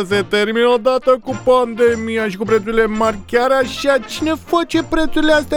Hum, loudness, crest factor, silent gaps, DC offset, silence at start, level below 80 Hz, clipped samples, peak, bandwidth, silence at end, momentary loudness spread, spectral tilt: none; -16 LUFS; 14 dB; none; under 0.1%; 0 s; -36 dBFS; under 0.1%; 0 dBFS; 18 kHz; 0 s; 4 LU; -4.5 dB/octave